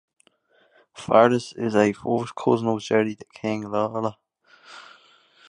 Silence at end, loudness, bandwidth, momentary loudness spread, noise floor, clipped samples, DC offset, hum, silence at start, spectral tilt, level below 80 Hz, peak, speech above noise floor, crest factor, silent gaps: 0.65 s; -23 LUFS; 11 kHz; 17 LU; -62 dBFS; under 0.1%; under 0.1%; none; 0.95 s; -6 dB/octave; -64 dBFS; -2 dBFS; 40 dB; 22 dB; none